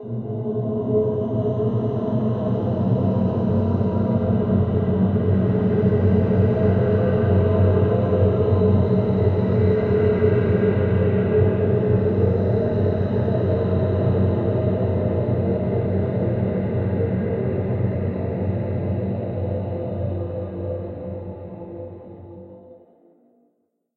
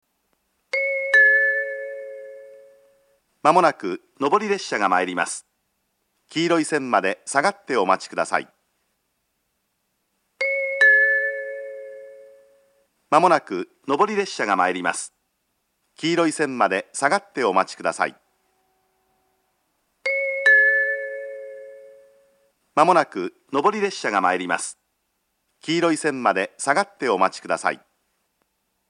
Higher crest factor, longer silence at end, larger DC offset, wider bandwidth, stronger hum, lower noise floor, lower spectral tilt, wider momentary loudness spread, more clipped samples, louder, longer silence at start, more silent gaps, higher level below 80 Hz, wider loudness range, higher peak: second, 14 dB vs 22 dB; about the same, 1.25 s vs 1.15 s; neither; second, 4.3 kHz vs 11.5 kHz; neither; second, -69 dBFS vs -73 dBFS; first, -12 dB/octave vs -3.5 dB/octave; second, 9 LU vs 17 LU; neither; about the same, -21 LUFS vs -20 LUFS; second, 0 s vs 0.75 s; neither; first, -42 dBFS vs -80 dBFS; first, 9 LU vs 4 LU; second, -6 dBFS vs 0 dBFS